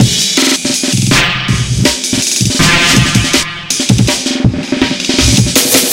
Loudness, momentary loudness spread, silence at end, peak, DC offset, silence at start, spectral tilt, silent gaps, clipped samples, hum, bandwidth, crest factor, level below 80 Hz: -10 LUFS; 6 LU; 0 s; 0 dBFS; under 0.1%; 0 s; -3 dB/octave; none; 0.5%; none; over 20 kHz; 10 dB; -26 dBFS